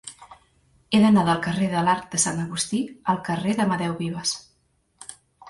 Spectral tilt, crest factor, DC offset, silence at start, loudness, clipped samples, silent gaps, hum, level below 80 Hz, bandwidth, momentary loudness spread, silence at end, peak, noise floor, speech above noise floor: -4.5 dB/octave; 18 dB; under 0.1%; 0.05 s; -23 LUFS; under 0.1%; none; none; -58 dBFS; 11.5 kHz; 22 LU; 0 s; -6 dBFS; -67 dBFS; 44 dB